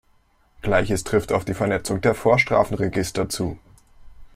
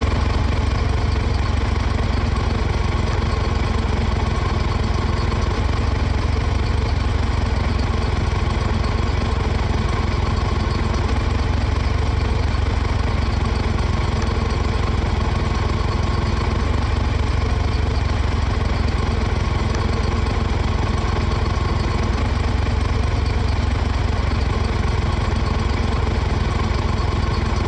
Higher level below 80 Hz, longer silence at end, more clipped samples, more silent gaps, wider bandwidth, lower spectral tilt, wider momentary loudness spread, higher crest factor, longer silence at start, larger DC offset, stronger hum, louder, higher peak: second, -44 dBFS vs -22 dBFS; about the same, 0.05 s vs 0 s; neither; neither; first, 16 kHz vs 9 kHz; about the same, -5.5 dB/octave vs -6.5 dB/octave; first, 9 LU vs 0 LU; first, 20 dB vs 12 dB; first, 0.65 s vs 0 s; neither; neither; about the same, -22 LUFS vs -21 LUFS; first, -4 dBFS vs -8 dBFS